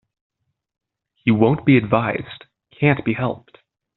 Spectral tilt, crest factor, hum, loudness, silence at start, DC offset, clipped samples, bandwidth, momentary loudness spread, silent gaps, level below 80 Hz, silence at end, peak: -6.5 dB/octave; 20 dB; none; -19 LUFS; 1.25 s; under 0.1%; under 0.1%; 4.2 kHz; 12 LU; none; -52 dBFS; 0.6 s; -2 dBFS